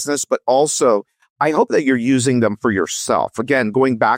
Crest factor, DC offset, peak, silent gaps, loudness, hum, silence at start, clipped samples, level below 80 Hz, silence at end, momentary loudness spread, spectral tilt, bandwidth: 12 dB; under 0.1%; -4 dBFS; 1.30-1.36 s; -17 LUFS; none; 0 s; under 0.1%; -60 dBFS; 0 s; 4 LU; -4.5 dB/octave; 16.5 kHz